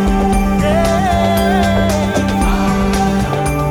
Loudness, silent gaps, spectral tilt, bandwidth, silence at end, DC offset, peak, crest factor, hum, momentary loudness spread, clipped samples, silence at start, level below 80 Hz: -14 LUFS; none; -6 dB/octave; 19 kHz; 0 s; under 0.1%; -2 dBFS; 12 dB; none; 2 LU; under 0.1%; 0 s; -22 dBFS